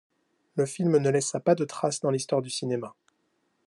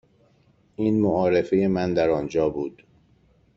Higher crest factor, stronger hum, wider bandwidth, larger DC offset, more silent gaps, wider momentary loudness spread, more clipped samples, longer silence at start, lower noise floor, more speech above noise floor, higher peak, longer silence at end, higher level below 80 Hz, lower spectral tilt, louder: about the same, 18 dB vs 16 dB; neither; first, 12 kHz vs 7.4 kHz; neither; neither; about the same, 9 LU vs 10 LU; neither; second, 0.55 s vs 0.8 s; first, -73 dBFS vs -61 dBFS; first, 47 dB vs 39 dB; about the same, -10 dBFS vs -8 dBFS; about the same, 0.75 s vs 0.85 s; second, -76 dBFS vs -54 dBFS; second, -5 dB/octave vs -8 dB/octave; second, -27 LUFS vs -23 LUFS